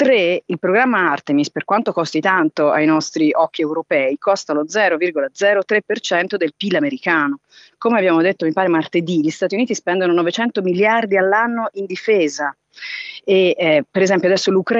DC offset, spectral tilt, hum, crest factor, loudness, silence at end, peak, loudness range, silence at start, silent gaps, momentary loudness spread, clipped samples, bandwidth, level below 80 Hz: under 0.1%; -5 dB/octave; none; 14 dB; -17 LUFS; 0 s; -2 dBFS; 1 LU; 0 s; none; 6 LU; under 0.1%; 8 kHz; -72 dBFS